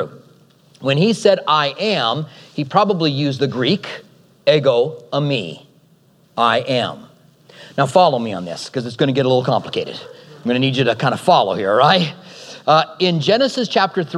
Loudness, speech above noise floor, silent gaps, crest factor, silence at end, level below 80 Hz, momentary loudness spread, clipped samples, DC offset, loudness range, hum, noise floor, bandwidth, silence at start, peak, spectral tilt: -17 LUFS; 37 dB; none; 18 dB; 0 s; -68 dBFS; 13 LU; under 0.1%; under 0.1%; 4 LU; none; -53 dBFS; 12.5 kHz; 0 s; 0 dBFS; -5.5 dB/octave